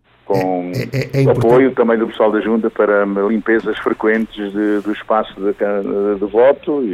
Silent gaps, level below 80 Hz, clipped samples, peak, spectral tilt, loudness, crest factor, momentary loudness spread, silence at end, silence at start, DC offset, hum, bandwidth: none; -50 dBFS; under 0.1%; 0 dBFS; -8 dB/octave; -16 LUFS; 14 dB; 8 LU; 0 s; 0.3 s; under 0.1%; none; 14.5 kHz